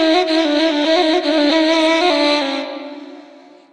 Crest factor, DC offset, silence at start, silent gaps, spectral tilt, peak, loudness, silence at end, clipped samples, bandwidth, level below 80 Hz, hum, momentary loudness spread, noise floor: 14 dB; under 0.1%; 0 s; none; -1.5 dB/octave; -2 dBFS; -15 LUFS; 0.5 s; under 0.1%; 10 kHz; -66 dBFS; none; 14 LU; -43 dBFS